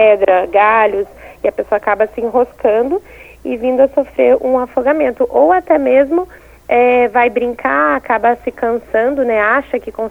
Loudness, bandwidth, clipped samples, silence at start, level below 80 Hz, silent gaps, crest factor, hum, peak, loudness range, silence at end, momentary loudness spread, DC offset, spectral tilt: -13 LUFS; 4.3 kHz; under 0.1%; 0 s; -44 dBFS; none; 14 dB; none; 0 dBFS; 2 LU; 0 s; 9 LU; under 0.1%; -6.5 dB/octave